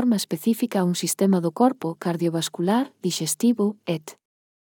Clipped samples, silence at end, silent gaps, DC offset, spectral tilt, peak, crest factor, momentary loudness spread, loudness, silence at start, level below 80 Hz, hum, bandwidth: under 0.1%; 0.6 s; none; under 0.1%; -5 dB/octave; -6 dBFS; 18 dB; 7 LU; -23 LUFS; 0 s; -80 dBFS; none; 19.5 kHz